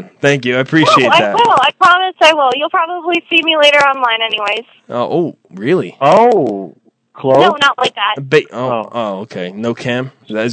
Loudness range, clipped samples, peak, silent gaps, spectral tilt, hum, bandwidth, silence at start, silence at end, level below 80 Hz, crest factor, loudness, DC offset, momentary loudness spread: 5 LU; 0.4%; 0 dBFS; none; -4.5 dB/octave; none; 11 kHz; 0 s; 0 s; -62 dBFS; 12 dB; -12 LUFS; under 0.1%; 12 LU